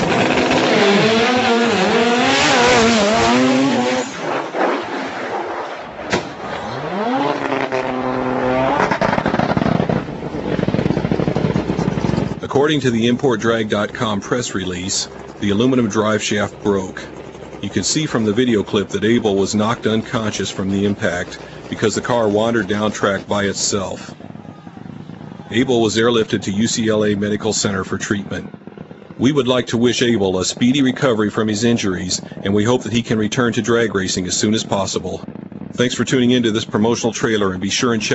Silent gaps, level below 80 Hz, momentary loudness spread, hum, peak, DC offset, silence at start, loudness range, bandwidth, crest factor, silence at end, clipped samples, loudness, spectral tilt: none; -44 dBFS; 13 LU; none; 0 dBFS; under 0.1%; 0 s; 5 LU; 8.2 kHz; 18 dB; 0 s; under 0.1%; -17 LUFS; -4.5 dB/octave